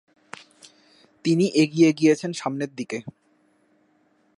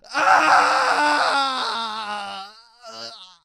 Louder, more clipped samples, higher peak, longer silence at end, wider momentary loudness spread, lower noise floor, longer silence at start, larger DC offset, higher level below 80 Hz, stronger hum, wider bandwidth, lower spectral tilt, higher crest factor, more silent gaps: second, -22 LUFS vs -18 LUFS; neither; second, -6 dBFS vs -2 dBFS; first, 1.3 s vs 0.2 s; first, 25 LU vs 21 LU; first, -64 dBFS vs -43 dBFS; first, 1.25 s vs 0.1 s; neither; second, -76 dBFS vs -68 dBFS; neither; second, 11.5 kHz vs 16 kHz; first, -6 dB/octave vs -1 dB/octave; about the same, 18 dB vs 20 dB; neither